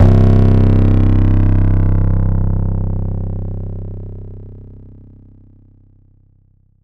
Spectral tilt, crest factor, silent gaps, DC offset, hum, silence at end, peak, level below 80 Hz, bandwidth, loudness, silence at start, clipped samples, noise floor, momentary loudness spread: -11 dB/octave; 14 dB; none; under 0.1%; none; 2.2 s; 0 dBFS; -18 dBFS; 3.8 kHz; -15 LUFS; 0 s; under 0.1%; -52 dBFS; 20 LU